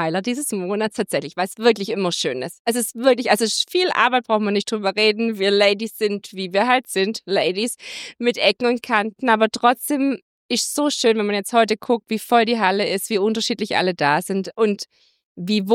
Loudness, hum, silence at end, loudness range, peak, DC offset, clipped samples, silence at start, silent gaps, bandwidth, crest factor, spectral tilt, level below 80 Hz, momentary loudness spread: -20 LUFS; none; 0 s; 2 LU; -2 dBFS; under 0.1%; under 0.1%; 0 s; 2.59-2.65 s, 10.22-10.49 s, 15.24-15.35 s; 17.5 kHz; 18 dB; -3.5 dB/octave; -72 dBFS; 7 LU